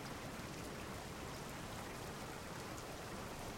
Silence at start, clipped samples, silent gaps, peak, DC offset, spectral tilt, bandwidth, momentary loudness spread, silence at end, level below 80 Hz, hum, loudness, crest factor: 0 s; under 0.1%; none; -34 dBFS; under 0.1%; -4 dB/octave; 16 kHz; 1 LU; 0 s; -60 dBFS; none; -48 LUFS; 14 dB